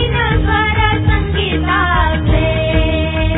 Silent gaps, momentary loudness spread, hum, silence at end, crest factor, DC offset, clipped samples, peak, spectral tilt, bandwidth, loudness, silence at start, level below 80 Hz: none; 3 LU; none; 0 s; 12 dB; under 0.1%; under 0.1%; -2 dBFS; -10 dB/octave; 4 kHz; -14 LUFS; 0 s; -18 dBFS